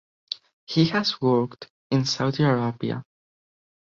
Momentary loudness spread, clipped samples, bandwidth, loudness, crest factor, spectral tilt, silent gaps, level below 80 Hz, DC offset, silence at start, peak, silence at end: 13 LU; under 0.1%; 7.6 kHz; -24 LUFS; 18 dB; -6 dB/octave; 0.53-0.67 s, 1.70-1.90 s; -62 dBFS; under 0.1%; 0.3 s; -6 dBFS; 0.85 s